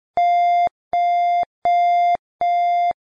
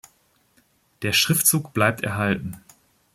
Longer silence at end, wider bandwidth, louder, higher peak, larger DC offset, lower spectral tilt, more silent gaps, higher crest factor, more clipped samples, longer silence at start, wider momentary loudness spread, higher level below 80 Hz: second, 0.15 s vs 0.55 s; second, 6.6 kHz vs 16.5 kHz; first, -18 LUFS vs -21 LUFS; second, -10 dBFS vs -2 dBFS; neither; about the same, -3.5 dB/octave vs -3 dB/octave; first, 0.71-0.91 s, 1.46-1.62 s, 2.19-2.39 s vs none; second, 8 dB vs 22 dB; neither; second, 0.15 s vs 1 s; second, 5 LU vs 12 LU; about the same, -62 dBFS vs -58 dBFS